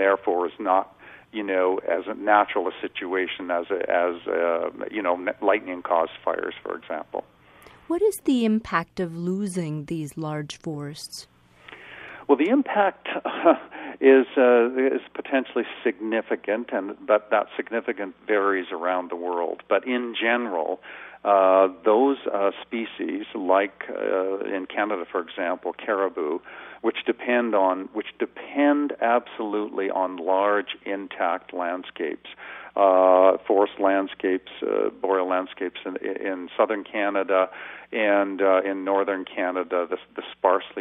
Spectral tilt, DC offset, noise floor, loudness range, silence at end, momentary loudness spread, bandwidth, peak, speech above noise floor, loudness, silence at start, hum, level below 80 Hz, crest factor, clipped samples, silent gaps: -5.5 dB/octave; under 0.1%; -51 dBFS; 5 LU; 0 s; 12 LU; 14 kHz; -4 dBFS; 27 dB; -24 LUFS; 0 s; none; -68 dBFS; 20 dB; under 0.1%; none